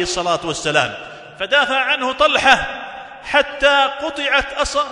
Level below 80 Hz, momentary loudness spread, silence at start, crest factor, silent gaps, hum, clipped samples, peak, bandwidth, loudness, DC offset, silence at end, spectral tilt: -42 dBFS; 15 LU; 0 s; 18 dB; none; none; under 0.1%; 0 dBFS; 12 kHz; -16 LUFS; under 0.1%; 0 s; -2 dB/octave